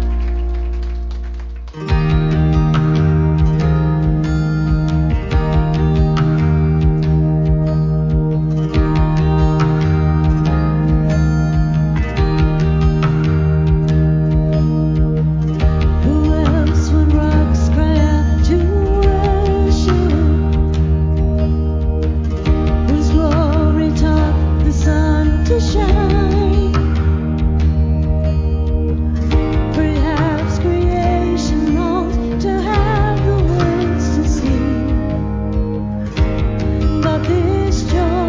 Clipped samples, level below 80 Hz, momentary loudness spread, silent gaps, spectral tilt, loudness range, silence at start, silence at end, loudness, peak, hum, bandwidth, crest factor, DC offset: under 0.1%; -18 dBFS; 4 LU; none; -8 dB/octave; 2 LU; 0 s; 0 s; -16 LUFS; 0 dBFS; none; 7.6 kHz; 14 dB; under 0.1%